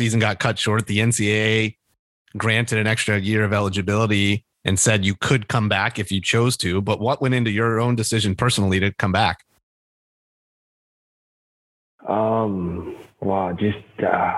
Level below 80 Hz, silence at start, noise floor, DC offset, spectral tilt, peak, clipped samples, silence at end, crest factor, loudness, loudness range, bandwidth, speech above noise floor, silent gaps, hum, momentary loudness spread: -52 dBFS; 0 s; under -90 dBFS; under 0.1%; -4.5 dB/octave; -2 dBFS; under 0.1%; 0 s; 20 dB; -20 LUFS; 8 LU; 12.5 kHz; over 70 dB; 1.99-2.25 s, 9.63-11.98 s; none; 6 LU